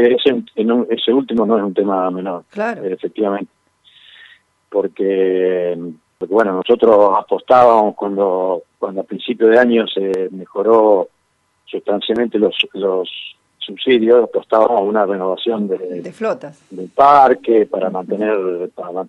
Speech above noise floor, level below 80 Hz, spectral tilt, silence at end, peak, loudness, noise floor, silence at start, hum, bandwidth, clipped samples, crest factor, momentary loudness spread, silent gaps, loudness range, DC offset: 48 dB; -62 dBFS; -7 dB/octave; 0 s; 0 dBFS; -15 LUFS; -63 dBFS; 0 s; none; 6.6 kHz; under 0.1%; 16 dB; 14 LU; none; 6 LU; under 0.1%